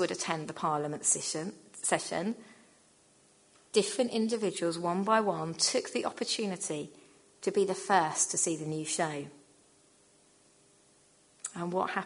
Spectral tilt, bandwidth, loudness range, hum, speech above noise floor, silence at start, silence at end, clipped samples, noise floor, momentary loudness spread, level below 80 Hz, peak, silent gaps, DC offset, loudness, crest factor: -3 dB/octave; 11 kHz; 4 LU; none; 33 dB; 0 s; 0 s; under 0.1%; -64 dBFS; 10 LU; -78 dBFS; -10 dBFS; none; under 0.1%; -31 LUFS; 22 dB